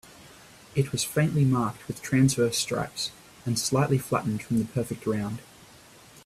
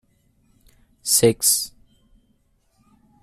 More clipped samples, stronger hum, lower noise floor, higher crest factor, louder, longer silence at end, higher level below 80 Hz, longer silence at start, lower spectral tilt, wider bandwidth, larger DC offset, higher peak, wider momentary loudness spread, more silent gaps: neither; neither; second, -52 dBFS vs -64 dBFS; about the same, 18 dB vs 22 dB; second, -27 LUFS vs -18 LUFS; second, 0.05 s vs 1.55 s; about the same, -58 dBFS vs -56 dBFS; second, 0.25 s vs 1.05 s; first, -5 dB/octave vs -2.5 dB/octave; about the same, 15.5 kHz vs 15.5 kHz; neither; second, -10 dBFS vs -2 dBFS; second, 10 LU vs 16 LU; neither